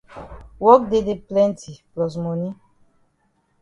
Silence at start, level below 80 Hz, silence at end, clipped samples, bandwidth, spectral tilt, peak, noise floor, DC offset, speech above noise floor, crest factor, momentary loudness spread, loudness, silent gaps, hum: 0.15 s; -50 dBFS; 1.1 s; under 0.1%; 10.5 kHz; -7.5 dB/octave; 0 dBFS; -66 dBFS; under 0.1%; 47 dB; 22 dB; 23 LU; -19 LUFS; none; none